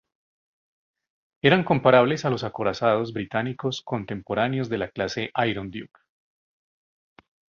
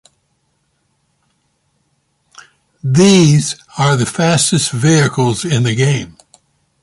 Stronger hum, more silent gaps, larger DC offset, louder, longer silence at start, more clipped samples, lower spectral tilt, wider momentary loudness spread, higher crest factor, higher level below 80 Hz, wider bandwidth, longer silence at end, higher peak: neither; neither; neither; second, -24 LUFS vs -13 LUFS; second, 1.45 s vs 2.85 s; neither; about the same, -6 dB/octave vs -5 dB/octave; about the same, 12 LU vs 10 LU; first, 24 dB vs 14 dB; second, -58 dBFS vs -48 dBFS; second, 7.4 kHz vs 11.5 kHz; first, 1.7 s vs 0.75 s; about the same, -2 dBFS vs 0 dBFS